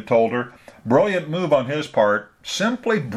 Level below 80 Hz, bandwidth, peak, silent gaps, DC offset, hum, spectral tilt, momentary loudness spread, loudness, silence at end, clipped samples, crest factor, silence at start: -62 dBFS; 13 kHz; -4 dBFS; none; under 0.1%; none; -5.5 dB/octave; 9 LU; -21 LUFS; 0 s; under 0.1%; 16 dB; 0 s